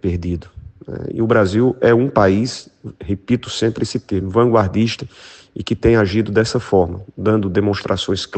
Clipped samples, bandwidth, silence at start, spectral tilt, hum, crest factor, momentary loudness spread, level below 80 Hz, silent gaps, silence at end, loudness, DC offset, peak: under 0.1%; 8.8 kHz; 0.05 s; -6.5 dB/octave; none; 18 dB; 15 LU; -42 dBFS; none; 0 s; -17 LUFS; under 0.1%; 0 dBFS